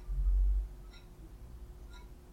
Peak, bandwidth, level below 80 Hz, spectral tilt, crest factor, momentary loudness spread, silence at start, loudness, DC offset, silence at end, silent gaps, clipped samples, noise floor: -22 dBFS; 5.8 kHz; -36 dBFS; -7 dB/octave; 14 dB; 21 LU; 0 s; -36 LUFS; under 0.1%; 0 s; none; under 0.1%; -51 dBFS